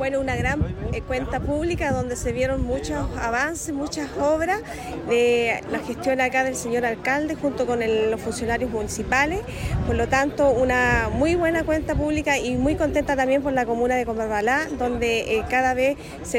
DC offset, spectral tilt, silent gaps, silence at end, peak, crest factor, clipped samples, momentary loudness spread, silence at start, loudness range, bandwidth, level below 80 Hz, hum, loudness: under 0.1%; -5 dB/octave; none; 0 s; -8 dBFS; 16 dB; under 0.1%; 7 LU; 0 s; 4 LU; 16 kHz; -36 dBFS; none; -23 LUFS